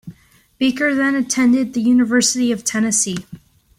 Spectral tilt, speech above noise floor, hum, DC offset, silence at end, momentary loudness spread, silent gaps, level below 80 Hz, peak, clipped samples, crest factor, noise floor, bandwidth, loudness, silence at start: -3 dB/octave; 32 dB; none; under 0.1%; 0.4 s; 6 LU; none; -56 dBFS; -4 dBFS; under 0.1%; 14 dB; -49 dBFS; 15.5 kHz; -16 LUFS; 0.05 s